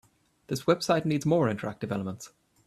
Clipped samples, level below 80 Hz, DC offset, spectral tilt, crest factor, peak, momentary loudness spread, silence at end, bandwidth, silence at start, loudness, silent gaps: under 0.1%; -64 dBFS; under 0.1%; -6 dB/octave; 18 dB; -10 dBFS; 13 LU; 0.4 s; 14.5 kHz; 0.5 s; -28 LUFS; none